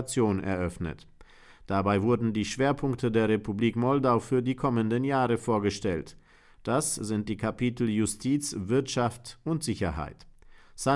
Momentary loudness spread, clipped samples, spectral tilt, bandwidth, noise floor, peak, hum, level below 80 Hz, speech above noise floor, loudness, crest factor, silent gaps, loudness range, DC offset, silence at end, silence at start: 8 LU; under 0.1%; -5.5 dB/octave; 12 kHz; -53 dBFS; -12 dBFS; none; -52 dBFS; 25 dB; -28 LUFS; 16 dB; none; 3 LU; under 0.1%; 0 s; 0 s